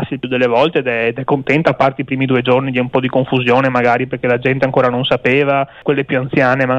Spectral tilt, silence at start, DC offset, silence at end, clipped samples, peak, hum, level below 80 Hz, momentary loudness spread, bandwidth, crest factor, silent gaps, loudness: -7.5 dB/octave; 0 s; under 0.1%; 0 s; under 0.1%; -2 dBFS; none; -50 dBFS; 4 LU; 7.8 kHz; 12 dB; none; -15 LUFS